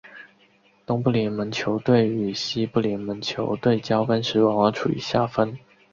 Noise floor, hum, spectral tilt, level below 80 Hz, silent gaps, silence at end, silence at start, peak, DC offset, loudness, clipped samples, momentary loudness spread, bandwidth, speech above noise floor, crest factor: -59 dBFS; none; -6.5 dB/octave; -56 dBFS; none; 0.35 s; 0.05 s; -4 dBFS; under 0.1%; -23 LUFS; under 0.1%; 7 LU; 7.6 kHz; 37 dB; 20 dB